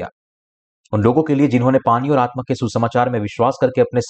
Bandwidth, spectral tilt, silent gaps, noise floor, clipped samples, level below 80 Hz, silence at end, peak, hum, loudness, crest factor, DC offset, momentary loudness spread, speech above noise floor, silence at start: 8.6 kHz; -7.5 dB/octave; 0.12-0.84 s; under -90 dBFS; under 0.1%; -52 dBFS; 0 s; -4 dBFS; none; -17 LUFS; 14 dB; under 0.1%; 6 LU; over 74 dB; 0 s